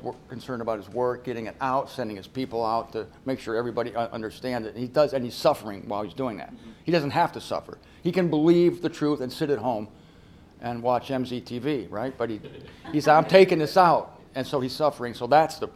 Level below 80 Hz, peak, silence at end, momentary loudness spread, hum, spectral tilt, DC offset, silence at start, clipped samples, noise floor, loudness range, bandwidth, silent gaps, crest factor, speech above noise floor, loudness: -58 dBFS; -2 dBFS; 0.05 s; 15 LU; none; -6.5 dB/octave; under 0.1%; 0 s; under 0.1%; -51 dBFS; 7 LU; 15 kHz; none; 22 dB; 26 dB; -25 LUFS